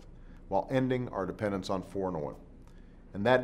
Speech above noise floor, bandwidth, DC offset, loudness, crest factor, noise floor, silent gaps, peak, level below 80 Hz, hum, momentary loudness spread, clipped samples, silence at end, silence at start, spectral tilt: 21 dB; 13 kHz; under 0.1%; -33 LUFS; 22 dB; -51 dBFS; none; -10 dBFS; -52 dBFS; none; 11 LU; under 0.1%; 0 s; 0 s; -7 dB/octave